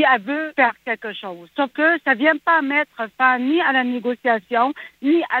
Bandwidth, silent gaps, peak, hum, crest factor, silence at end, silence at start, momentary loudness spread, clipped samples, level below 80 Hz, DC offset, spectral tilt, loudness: 6.2 kHz; none; -2 dBFS; none; 16 dB; 0 s; 0 s; 10 LU; under 0.1%; -74 dBFS; under 0.1%; -5.5 dB/octave; -19 LUFS